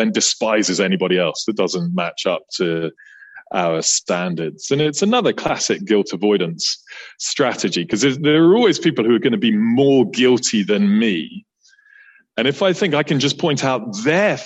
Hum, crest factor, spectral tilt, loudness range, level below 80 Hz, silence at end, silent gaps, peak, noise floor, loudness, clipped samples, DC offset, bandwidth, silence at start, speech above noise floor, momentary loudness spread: none; 14 dB; -4 dB/octave; 5 LU; -60 dBFS; 0 s; none; -4 dBFS; -51 dBFS; -17 LUFS; under 0.1%; under 0.1%; 8.6 kHz; 0 s; 34 dB; 7 LU